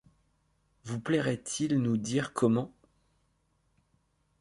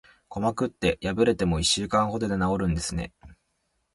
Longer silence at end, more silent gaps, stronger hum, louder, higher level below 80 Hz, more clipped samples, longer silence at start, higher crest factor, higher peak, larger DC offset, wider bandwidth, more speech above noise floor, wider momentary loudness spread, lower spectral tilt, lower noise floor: first, 1.7 s vs 0.6 s; neither; neither; second, -30 LUFS vs -26 LUFS; second, -66 dBFS vs -42 dBFS; neither; first, 0.85 s vs 0.3 s; about the same, 20 dB vs 18 dB; second, -14 dBFS vs -8 dBFS; neither; about the same, 11.5 kHz vs 11.5 kHz; second, 44 dB vs 49 dB; first, 12 LU vs 9 LU; about the same, -5.5 dB/octave vs -4.5 dB/octave; about the same, -73 dBFS vs -74 dBFS